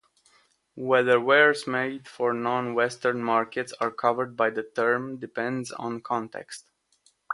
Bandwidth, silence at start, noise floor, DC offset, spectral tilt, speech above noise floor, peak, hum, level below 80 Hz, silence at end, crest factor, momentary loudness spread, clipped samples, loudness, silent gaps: 11.5 kHz; 0.75 s; -66 dBFS; under 0.1%; -4.5 dB/octave; 41 dB; -4 dBFS; none; -74 dBFS; 0 s; 22 dB; 14 LU; under 0.1%; -25 LUFS; none